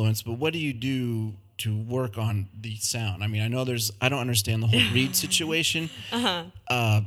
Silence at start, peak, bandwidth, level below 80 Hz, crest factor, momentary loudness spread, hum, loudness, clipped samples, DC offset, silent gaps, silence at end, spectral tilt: 0 s; -6 dBFS; 17 kHz; -58 dBFS; 20 dB; 9 LU; none; -26 LUFS; under 0.1%; under 0.1%; none; 0 s; -4 dB/octave